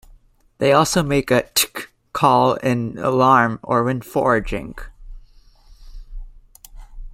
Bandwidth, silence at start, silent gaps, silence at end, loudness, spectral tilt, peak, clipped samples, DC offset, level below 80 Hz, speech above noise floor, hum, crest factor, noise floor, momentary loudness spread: 16 kHz; 0.6 s; none; 0 s; -18 LUFS; -4.5 dB/octave; 0 dBFS; under 0.1%; under 0.1%; -40 dBFS; 33 dB; none; 20 dB; -51 dBFS; 14 LU